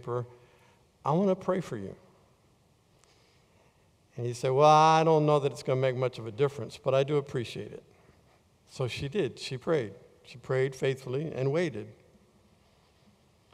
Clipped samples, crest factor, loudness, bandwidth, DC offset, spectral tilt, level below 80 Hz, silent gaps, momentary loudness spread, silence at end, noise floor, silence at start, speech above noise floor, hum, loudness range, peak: under 0.1%; 22 dB; -28 LUFS; 13 kHz; under 0.1%; -6.5 dB/octave; -66 dBFS; none; 20 LU; 1.6 s; -65 dBFS; 0.05 s; 37 dB; none; 9 LU; -8 dBFS